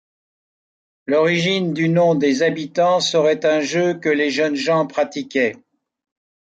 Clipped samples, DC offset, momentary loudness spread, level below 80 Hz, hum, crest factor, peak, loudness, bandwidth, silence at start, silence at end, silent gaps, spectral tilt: under 0.1%; under 0.1%; 5 LU; -68 dBFS; none; 14 dB; -6 dBFS; -18 LUFS; 9 kHz; 1.1 s; 0.95 s; none; -5 dB/octave